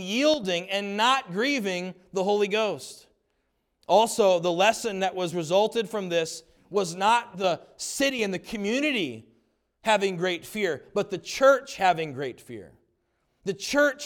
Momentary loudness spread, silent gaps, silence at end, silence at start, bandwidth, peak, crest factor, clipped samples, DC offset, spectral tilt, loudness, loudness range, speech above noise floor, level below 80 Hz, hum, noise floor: 12 LU; none; 0 s; 0 s; 18.5 kHz; -8 dBFS; 18 dB; under 0.1%; under 0.1%; -3.5 dB/octave; -25 LUFS; 3 LU; 49 dB; -66 dBFS; none; -74 dBFS